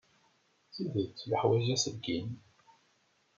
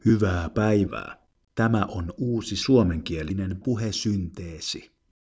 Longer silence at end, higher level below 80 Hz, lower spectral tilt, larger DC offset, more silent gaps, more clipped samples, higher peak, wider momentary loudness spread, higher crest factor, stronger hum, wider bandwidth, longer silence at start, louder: first, 1 s vs 0.4 s; second, -70 dBFS vs -40 dBFS; about the same, -5 dB/octave vs -6 dB/octave; neither; neither; neither; second, -14 dBFS vs -8 dBFS; first, 16 LU vs 13 LU; about the same, 20 dB vs 18 dB; neither; about the same, 7.6 kHz vs 8 kHz; first, 0.75 s vs 0.05 s; second, -33 LUFS vs -25 LUFS